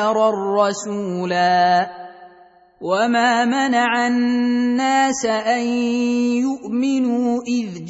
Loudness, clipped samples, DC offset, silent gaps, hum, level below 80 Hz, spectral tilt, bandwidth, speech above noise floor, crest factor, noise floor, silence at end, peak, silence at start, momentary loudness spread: -18 LUFS; under 0.1%; under 0.1%; none; none; -64 dBFS; -4.5 dB/octave; 8 kHz; 31 dB; 14 dB; -49 dBFS; 0 s; -4 dBFS; 0 s; 7 LU